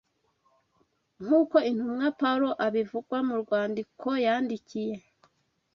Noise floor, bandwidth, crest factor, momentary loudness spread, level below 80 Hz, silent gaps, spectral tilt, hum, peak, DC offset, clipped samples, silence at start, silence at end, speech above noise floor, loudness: -71 dBFS; 6.8 kHz; 20 dB; 10 LU; -74 dBFS; none; -6.5 dB/octave; none; -8 dBFS; under 0.1%; under 0.1%; 1.2 s; 0.75 s; 44 dB; -28 LUFS